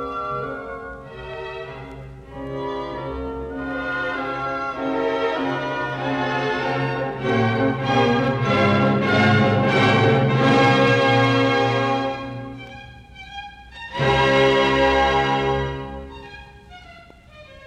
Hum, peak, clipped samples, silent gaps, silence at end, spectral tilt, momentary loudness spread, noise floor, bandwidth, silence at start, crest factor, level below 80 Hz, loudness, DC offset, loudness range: none; -4 dBFS; under 0.1%; none; 0 s; -6.5 dB/octave; 20 LU; -45 dBFS; 9.8 kHz; 0 s; 18 dB; -42 dBFS; -20 LUFS; under 0.1%; 11 LU